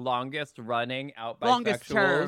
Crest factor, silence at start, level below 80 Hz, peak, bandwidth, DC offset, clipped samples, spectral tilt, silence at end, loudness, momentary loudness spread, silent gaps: 18 dB; 0 s; -66 dBFS; -10 dBFS; 15.5 kHz; under 0.1%; under 0.1%; -5 dB/octave; 0 s; -28 LUFS; 10 LU; none